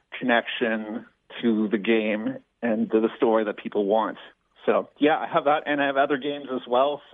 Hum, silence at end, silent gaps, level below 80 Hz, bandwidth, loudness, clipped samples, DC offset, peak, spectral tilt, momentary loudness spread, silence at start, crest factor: none; 0.15 s; none; -74 dBFS; 4 kHz; -24 LUFS; under 0.1%; under 0.1%; -8 dBFS; -8.5 dB/octave; 9 LU; 0.1 s; 18 dB